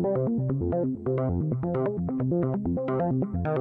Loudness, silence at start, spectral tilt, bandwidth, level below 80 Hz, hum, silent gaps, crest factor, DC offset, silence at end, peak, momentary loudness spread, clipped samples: -27 LUFS; 0 s; -12.5 dB/octave; 3.6 kHz; -50 dBFS; none; none; 12 dB; under 0.1%; 0 s; -14 dBFS; 2 LU; under 0.1%